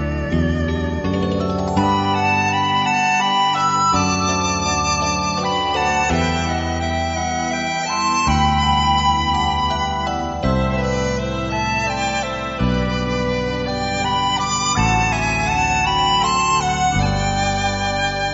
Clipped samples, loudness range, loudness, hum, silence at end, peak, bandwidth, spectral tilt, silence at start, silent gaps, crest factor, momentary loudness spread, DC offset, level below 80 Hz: under 0.1%; 3 LU; -18 LUFS; none; 0 s; -4 dBFS; 8 kHz; -3.5 dB/octave; 0 s; none; 14 dB; 5 LU; under 0.1%; -30 dBFS